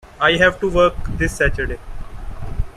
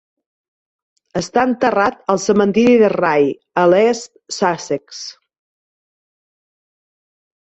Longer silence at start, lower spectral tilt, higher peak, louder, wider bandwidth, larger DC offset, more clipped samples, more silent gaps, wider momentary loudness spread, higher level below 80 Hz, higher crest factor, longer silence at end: second, 0.05 s vs 1.15 s; about the same, -5 dB/octave vs -5 dB/octave; about the same, -2 dBFS vs -2 dBFS; about the same, -17 LUFS vs -16 LUFS; first, 14 kHz vs 8.2 kHz; neither; neither; neither; first, 21 LU vs 14 LU; first, -28 dBFS vs -56 dBFS; about the same, 18 dB vs 16 dB; second, 0.05 s vs 2.45 s